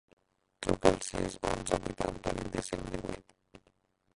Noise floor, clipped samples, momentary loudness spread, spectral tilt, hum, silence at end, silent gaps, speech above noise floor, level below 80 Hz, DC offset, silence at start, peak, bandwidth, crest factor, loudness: -72 dBFS; under 0.1%; 11 LU; -4.5 dB/octave; none; 0.6 s; none; 39 dB; -50 dBFS; under 0.1%; 0.6 s; -6 dBFS; 11.5 kHz; 28 dB; -34 LUFS